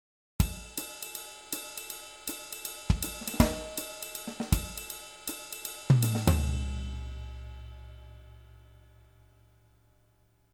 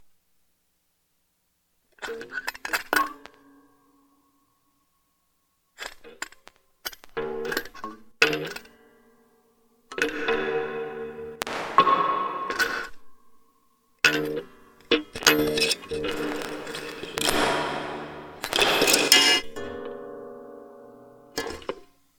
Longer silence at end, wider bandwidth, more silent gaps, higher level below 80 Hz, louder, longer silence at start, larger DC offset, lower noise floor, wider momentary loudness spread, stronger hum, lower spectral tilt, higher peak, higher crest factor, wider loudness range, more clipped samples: first, 1.75 s vs 0.35 s; about the same, over 20 kHz vs over 20 kHz; neither; first, -40 dBFS vs -56 dBFS; second, -33 LUFS vs -24 LUFS; second, 0.4 s vs 2 s; neither; second, -66 dBFS vs -72 dBFS; about the same, 20 LU vs 20 LU; first, 60 Hz at -55 dBFS vs 60 Hz at -70 dBFS; first, -5 dB/octave vs -1.5 dB/octave; second, -6 dBFS vs 0 dBFS; about the same, 28 dB vs 28 dB; about the same, 13 LU vs 14 LU; neither